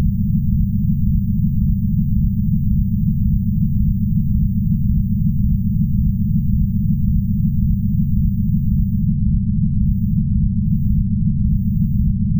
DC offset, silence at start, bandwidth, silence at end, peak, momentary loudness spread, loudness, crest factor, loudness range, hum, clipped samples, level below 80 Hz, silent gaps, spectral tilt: 0.5%; 0 s; 16 kHz; 0 s; -4 dBFS; 1 LU; -18 LUFS; 12 dB; 0 LU; none; under 0.1%; -22 dBFS; none; -18 dB/octave